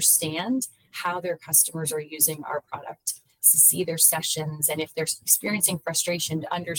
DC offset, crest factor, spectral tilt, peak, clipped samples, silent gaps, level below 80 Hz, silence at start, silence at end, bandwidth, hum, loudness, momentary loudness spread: under 0.1%; 22 dB; -2 dB/octave; -2 dBFS; under 0.1%; none; -70 dBFS; 0 s; 0 s; 19 kHz; none; -22 LUFS; 14 LU